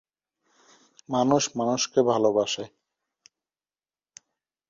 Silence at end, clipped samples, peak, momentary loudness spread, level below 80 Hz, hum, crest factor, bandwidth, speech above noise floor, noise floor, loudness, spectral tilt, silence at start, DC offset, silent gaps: 2.05 s; under 0.1%; -8 dBFS; 9 LU; -70 dBFS; none; 20 dB; 7.8 kHz; over 66 dB; under -90 dBFS; -24 LUFS; -4 dB/octave; 1.1 s; under 0.1%; none